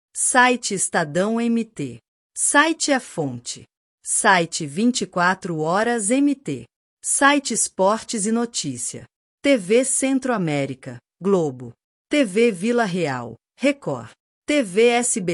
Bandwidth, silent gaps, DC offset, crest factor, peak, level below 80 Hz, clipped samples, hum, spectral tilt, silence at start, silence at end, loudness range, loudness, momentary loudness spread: 14 kHz; 2.08-2.30 s, 3.77-3.98 s, 6.76-6.97 s, 9.16-9.38 s, 11.84-12.05 s, 14.20-14.42 s; under 0.1%; 18 dB; -4 dBFS; -66 dBFS; under 0.1%; none; -3.5 dB/octave; 0.15 s; 0 s; 2 LU; -20 LUFS; 16 LU